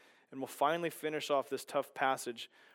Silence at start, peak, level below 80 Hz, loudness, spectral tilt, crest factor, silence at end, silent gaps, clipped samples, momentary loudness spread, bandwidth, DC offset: 0.3 s; -18 dBFS; under -90 dBFS; -36 LUFS; -3.5 dB/octave; 20 dB; 0.3 s; none; under 0.1%; 12 LU; 17 kHz; under 0.1%